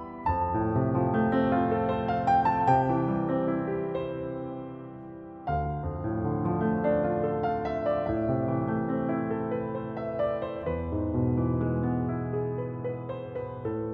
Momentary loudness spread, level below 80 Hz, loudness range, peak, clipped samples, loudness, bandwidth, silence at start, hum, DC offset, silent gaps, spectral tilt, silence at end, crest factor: 10 LU; -48 dBFS; 5 LU; -12 dBFS; under 0.1%; -29 LUFS; 7.4 kHz; 0 s; none; under 0.1%; none; -10 dB/octave; 0 s; 18 dB